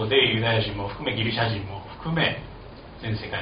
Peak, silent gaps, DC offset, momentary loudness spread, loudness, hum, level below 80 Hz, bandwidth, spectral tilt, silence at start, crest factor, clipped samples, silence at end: -6 dBFS; none; under 0.1%; 16 LU; -25 LUFS; none; -46 dBFS; 5.2 kHz; -3 dB/octave; 0 s; 20 dB; under 0.1%; 0 s